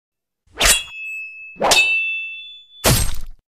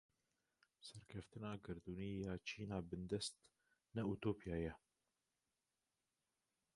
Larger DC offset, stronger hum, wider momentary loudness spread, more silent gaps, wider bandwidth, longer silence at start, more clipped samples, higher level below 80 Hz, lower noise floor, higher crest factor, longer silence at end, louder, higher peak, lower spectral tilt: neither; neither; first, 19 LU vs 12 LU; neither; first, 15.5 kHz vs 11 kHz; second, 0.55 s vs 0.8 s; neither; first, -32 dBFS vs -66 dBFS; second, -38 dBFS vs under -90 dBFS; about the same, 18 dB vs 22 dB; second, 0.2 s vs 2 s; first, -17 LUFS vs -48 LUFS; first, -2 dBFS vs -28 dBFS; second, -1.5 dB/octave vs -5.5 dB/octave